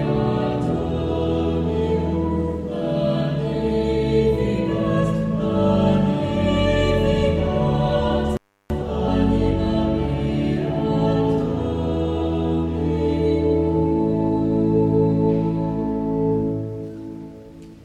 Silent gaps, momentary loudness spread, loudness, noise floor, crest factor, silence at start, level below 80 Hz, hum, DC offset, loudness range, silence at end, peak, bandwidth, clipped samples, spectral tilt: none; 6 LU; -21 LUFS; -40 dBFS; 14 dB; 0 s; -32 dBFS; none; under 0.1%; 2 LU; 0 s; -6 dBFS; 9.6 kHz; under 0.1%; -8.5 dB/octave